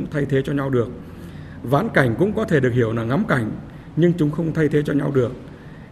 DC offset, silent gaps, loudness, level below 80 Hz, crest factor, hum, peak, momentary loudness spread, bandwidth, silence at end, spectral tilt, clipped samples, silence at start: under 0.1%; none; -20 LUFS; -46 dBFS; 18 dB; none; -2 dBFS; 18 LU; 13.5 kHz; 0 s; -8 dB/octave; under 0.1%; 0 s